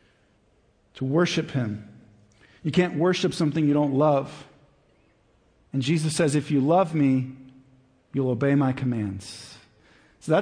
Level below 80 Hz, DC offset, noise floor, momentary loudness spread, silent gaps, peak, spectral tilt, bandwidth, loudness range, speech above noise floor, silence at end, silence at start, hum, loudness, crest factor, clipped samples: -62 dBFS; under 0.1%; -63 dBFS; 16 LU; none; -8 dBFS; -6.5 dB/octave; 10.5 kHz; 3 LU; 40 dB; 0 s; 0.95 s; none; -24 LUFS; 18 dB; under 0.1%